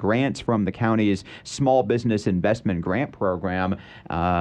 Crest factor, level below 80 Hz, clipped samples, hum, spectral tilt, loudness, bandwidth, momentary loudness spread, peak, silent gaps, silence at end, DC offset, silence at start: 16 dB; -48 dBFS; under 0.1%; none; -7 dB/octave; -23 LUFS; 10 kHz; 7 LU; -6 dBFS; none; 0 s; under 0.1%; 0 s